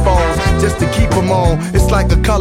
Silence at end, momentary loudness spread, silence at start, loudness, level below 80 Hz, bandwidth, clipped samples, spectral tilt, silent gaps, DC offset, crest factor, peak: 0 s; 2 LU; 0 s; -13 LUFS; -16 dBFS; 15.5 kHz; under 0.1%; -6 dB/octave; none; under 0.1%; 12 dB; 0 dBFS